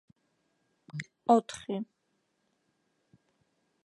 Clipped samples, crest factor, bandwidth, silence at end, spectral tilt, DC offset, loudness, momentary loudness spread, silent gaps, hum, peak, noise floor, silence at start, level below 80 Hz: under 0.1%; 26 dB; 11.5 kHz; 2 s; -6 dB/octave; under 0.1%; -30 LUFS; 18 LU; none; none; -10 dBFS; -78 dBFS; 0.95 s; -78 dBFS